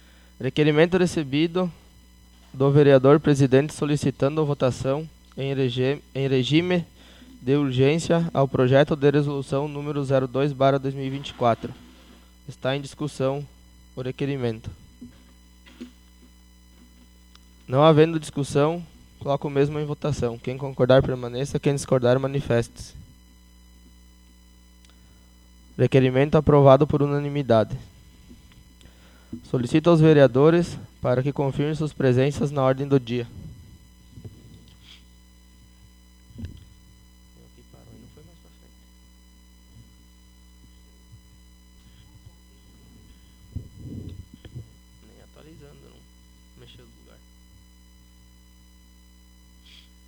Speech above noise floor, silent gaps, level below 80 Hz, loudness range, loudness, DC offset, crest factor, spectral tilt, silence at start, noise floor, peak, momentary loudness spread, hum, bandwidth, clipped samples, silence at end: 31 dB; none; -50 dBFS; 15 LU; -22 LUFS; under 0.1%; 22 dB; -7 dB/octave; 0.4 s; -52 dBFS; -2 dBFS; 24 LU; none; 12.5 kHz; under 0.1%; 4.4 s